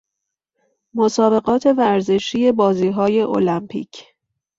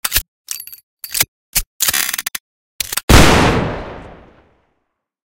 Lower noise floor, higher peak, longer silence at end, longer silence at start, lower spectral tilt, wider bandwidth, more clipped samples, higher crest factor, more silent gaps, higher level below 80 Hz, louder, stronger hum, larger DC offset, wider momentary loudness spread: first, -81 dBFS vs -71 dBFS; about the same, -2 dBFS vs 0 dBFS; second, 0.55 s vs 1.2 s; first, 0.95 s vs 0.05 s; first, -6 dB/octave vs -3.5 dB/octave; second, 8 kHz vs over 20 kHz; second, under 0.1% vs 0.2%; about the same, 16 dB vs 18 dB; second, none vs 0.28-0.45 s, 0.83-0.97 s, 1.28-1.53 s, 1.66-1.80 s, 2.40-2.79 s, 3.03-3.08 s; second, -58 dBFS vs -24 dBFS; about the same, -17 LUFS vs -15 LUFS; neither; neither; second, 13 LU vs 20 LU